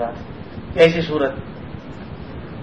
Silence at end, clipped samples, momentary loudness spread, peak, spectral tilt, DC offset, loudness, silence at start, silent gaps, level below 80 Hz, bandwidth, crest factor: 0 s; under 0.1%; 19 LU; 0 dBFS; -6.5 dB/octave; 0.7%; -18 LUFS; 0 s; none; -42 dBFS; 9.4 kHz; 22 dB